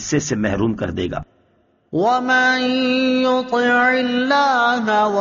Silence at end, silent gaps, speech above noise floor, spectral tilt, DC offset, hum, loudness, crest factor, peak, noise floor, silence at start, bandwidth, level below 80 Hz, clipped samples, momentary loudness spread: 0 s; none; 42 dB; -3 dB/octave; under 0.1%; none; -17 LUFS; 12 dB; -6 dBFS; -59 dBFS; 0 s; 7.2 kHz; -48 dBFS; under 0.1%; 8 LU